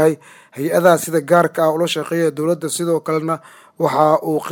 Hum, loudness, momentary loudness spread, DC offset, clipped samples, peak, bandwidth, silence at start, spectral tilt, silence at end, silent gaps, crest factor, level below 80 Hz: none; -17 LUFS; 10 LU; under 0.1%; under 0.1%; 0 dBFS; 19.5 kHz; 0 s; -5 dB/octave; 0 s; none; 16 dB; -68 dBFS